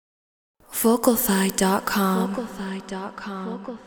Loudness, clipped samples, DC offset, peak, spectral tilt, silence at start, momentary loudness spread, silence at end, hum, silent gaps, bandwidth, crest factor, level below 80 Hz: -23 LUFS; under 0.1%; under 0.1%; -4 dBFS; -4.5 dB/octave; 0.7 s; 13 LU; 0 s; none; none; over 20 kHz; 20 dB; -56 dBFS